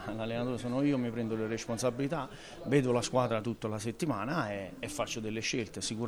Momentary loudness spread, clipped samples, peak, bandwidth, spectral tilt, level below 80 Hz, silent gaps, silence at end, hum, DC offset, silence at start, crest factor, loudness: 7 LU; under 0.1%; -14 dBFS; over 20 kHz; -5 dB/octave; -58 dBFS; none; 0 s; none; under 0.1%; 0 s; 18 dB; -33 LUFS